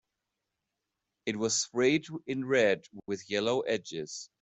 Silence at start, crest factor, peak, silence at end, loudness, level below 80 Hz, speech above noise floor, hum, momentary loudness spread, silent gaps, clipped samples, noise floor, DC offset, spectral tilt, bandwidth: 1.25 s; 18 dB; -14 dBFS; 0.15 s; -30 LUFS; -74 dBFS; 55 dB; none; 12 LU; none; under 0.1%; -86 dBFS; under 0.1%; -3.5 dB/octave; 8.2 kHz